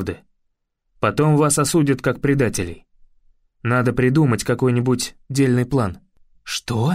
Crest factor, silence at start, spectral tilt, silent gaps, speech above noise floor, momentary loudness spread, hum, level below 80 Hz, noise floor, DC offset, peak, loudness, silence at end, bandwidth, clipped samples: 14 dB; 0 s; -5.5 dB/octave; none; 52 dB; 11 LU; none; -46 dBFS; -71 dBFS; under 0.1%; -6 dBFS; -19 LUFS; 0 s; 16 kHz; under 0.1%